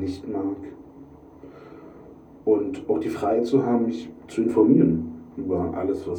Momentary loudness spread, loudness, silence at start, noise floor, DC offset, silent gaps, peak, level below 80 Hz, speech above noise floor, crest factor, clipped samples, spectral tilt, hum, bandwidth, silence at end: 25 LU; -23 LUFS; 0 s; -46 dBFS; under 0.1%; none; -6 dBFS; -56 dBFS; 23 dB; 18 dB; under 0.1%; -8.5 dB/octave; none; 10.5 kHz; 0 s